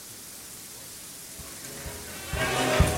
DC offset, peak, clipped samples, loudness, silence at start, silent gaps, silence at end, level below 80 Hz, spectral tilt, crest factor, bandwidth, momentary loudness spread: under 0.1%; -8 dBFS; under 0.1%; -32 LUFS; 0 s; none; 0 s; -38 dBFS; -4 dB/octave; 22 dB; 16.5 kHz; 15 LU